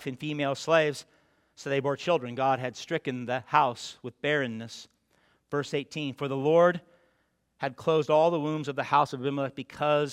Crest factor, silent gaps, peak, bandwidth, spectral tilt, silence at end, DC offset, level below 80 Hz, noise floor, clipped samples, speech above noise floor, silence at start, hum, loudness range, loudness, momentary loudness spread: 22 dB; none; -6 dBFS; 13 kHz; -5.5 dB/octave; 0 s; under 0.1%; -74 dBFS; -72 dBFS; under 0.1%; 45 dB; 0 s; none; 4 LU; -28 LUFS; 12 LU